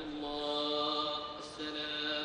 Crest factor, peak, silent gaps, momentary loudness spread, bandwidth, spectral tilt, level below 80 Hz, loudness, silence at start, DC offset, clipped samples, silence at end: 16 dB; -22 dBFS; none; 8 LU; 10 kHz; -3.5 dB/octave; -64 dBFS; -36 LUFS; 0 s; under 0.1%; under 0.1%; 0 s